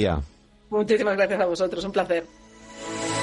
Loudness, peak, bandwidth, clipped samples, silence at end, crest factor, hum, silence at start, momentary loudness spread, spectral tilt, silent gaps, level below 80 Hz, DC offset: -25 LUFS; -10 dBFS; 11.5 kHz; under 0.1%; 0 s; 16 dB; none; 0 s; 18 LU; -5 dB/octave; none; -44 dBFS; under 0.1%